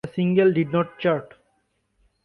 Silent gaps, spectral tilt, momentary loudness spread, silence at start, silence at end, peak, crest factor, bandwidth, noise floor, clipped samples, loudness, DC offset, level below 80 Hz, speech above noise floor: none; -9.5 dB/octave; 5 LU; 0.05 s; 1 s; -8 dBFS; 16 dB; 4.9 kHz; -70 dBFS; under 0.1%; -22 LUFS; under 0.1%; -62 dBFS; 49 dB